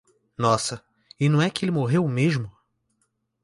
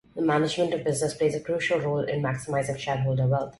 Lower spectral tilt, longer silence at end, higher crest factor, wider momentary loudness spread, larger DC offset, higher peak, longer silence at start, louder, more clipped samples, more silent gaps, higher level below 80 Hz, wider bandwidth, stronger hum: about the same, -6 dB/octave vs -5.5 dB/octave; first, 0.95 s vs 0.1 s; about the same, 18 dB vs 14 dB; first, 15 LU vs 4 LU; neither; first, -6 dBFS vs -12 dBFS; first, 0.4 s vs 0.15 s; first, -23 LUFS vs -26 LUFS; neither; neither; about the same, -60 dBFS vs -56 dBFS; about the same, 11.5 kHz vs 12 kHz; neither